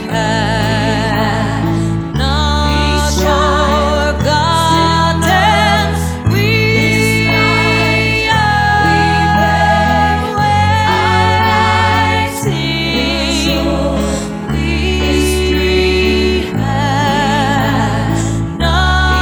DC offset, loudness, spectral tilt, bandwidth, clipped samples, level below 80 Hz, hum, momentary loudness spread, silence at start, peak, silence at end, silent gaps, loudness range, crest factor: under 0.1%; -12 LUFS; -5 dB/octave; over 20 kHz; under 0.1%; -22 dBFS; none; 5 LU; 0 s; 0 dBFS; 0 s; none; 3 LU; 12 dB